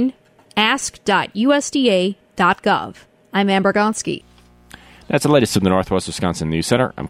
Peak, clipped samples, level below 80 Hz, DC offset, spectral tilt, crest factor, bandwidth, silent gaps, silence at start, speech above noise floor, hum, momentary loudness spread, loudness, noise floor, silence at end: -2 dBFS; under 0.1%; -46 dBFS; under 0.1%; -4.5 dB/octave; 16 dB; 15.5 kHz; none; 0 s; 27 dB; none; 8 LU; -18 LUFS; -45 dBFS; 0 s